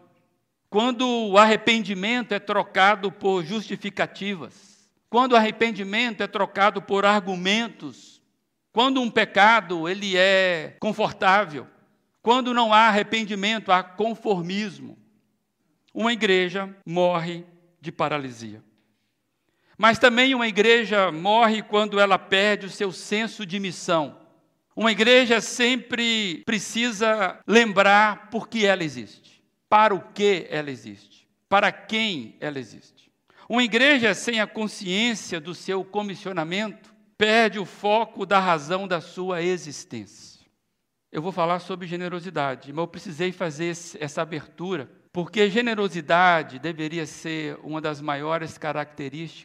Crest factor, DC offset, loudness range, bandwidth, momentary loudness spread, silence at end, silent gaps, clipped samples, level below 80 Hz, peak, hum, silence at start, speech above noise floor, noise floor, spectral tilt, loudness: 22 dB; under 0.1%; 8 LU; 13 kHz; 15 LU; 0.05 s; none; under 0.1%; -72 dBFS; 0 dBFS; none; 0.7 s; 55 dB; -77 dBFS; -4 dB/octave; -22 LUFS